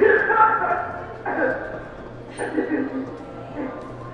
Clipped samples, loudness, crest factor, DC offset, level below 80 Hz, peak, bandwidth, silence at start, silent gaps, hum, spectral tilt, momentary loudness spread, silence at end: under 0.1%; -23 LUFS; 20 dB; under 0.1%; -50 dBFS; -4 dBFS; 9.6 kHz; 0 s; none; none; -6.5 dB/octave; 19 LU; 0 s